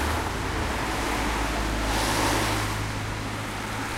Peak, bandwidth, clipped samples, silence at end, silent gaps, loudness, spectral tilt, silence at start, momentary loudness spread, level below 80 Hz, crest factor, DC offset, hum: -12 dBFS; 16 kHz; under 0.1%; 0 s; none; -27 LUFS; -4 dB/octave; 0 s; 7 LU; -34 dBFS; 14 dB; under 0.1%; none